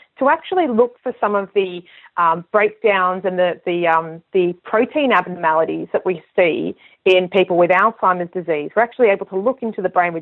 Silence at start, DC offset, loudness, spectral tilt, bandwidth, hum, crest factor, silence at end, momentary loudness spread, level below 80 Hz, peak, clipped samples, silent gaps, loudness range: 0.2 s; under 0.1%; -18 LUFS; -7.5 dB/octave; 6 kHz; none; 14 dB; 0 s; 7 LU; -66 dBFS; -2 dBFS; under 0.1%; none; 2 LU